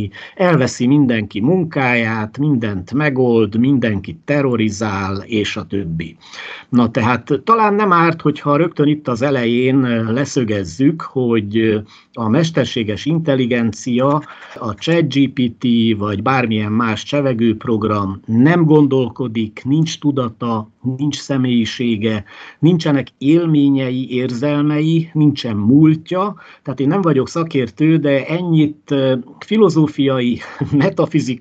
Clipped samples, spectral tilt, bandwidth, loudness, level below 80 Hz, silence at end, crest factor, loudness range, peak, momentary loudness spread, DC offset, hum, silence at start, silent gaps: under 0.1%; -7 dB/octave; 8.2 kHz; -16 LUFS; -54 dBFS; 0 s; 16 dB; 3 LU; 0 dBFS; 8 LU; under 0.1%; none; 0 s; none